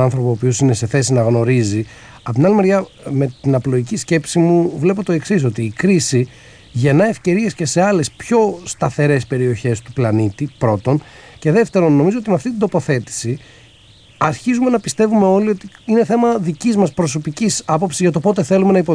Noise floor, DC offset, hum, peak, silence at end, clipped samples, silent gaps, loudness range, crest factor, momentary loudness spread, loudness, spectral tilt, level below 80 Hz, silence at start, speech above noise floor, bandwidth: -45 dBFS; under 0.1%; none; -2 dBFS; 0 s; under 0.1%; none; 2 LU; 14 dB; 7 LU; -16 LUFS; -6 dB/octave; -50 dBFS; 0 s; 30 dB; 11 kHz